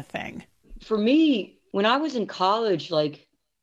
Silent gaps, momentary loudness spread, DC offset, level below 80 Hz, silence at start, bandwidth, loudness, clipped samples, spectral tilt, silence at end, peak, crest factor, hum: none; 14 LU; under 0.1%; -56 dBFS; 0 s; 7.8 kHz; -24 LUFS; under 0.1%; -6 dB/octave; 0.45 s; -6 dBFS; 18 dB; none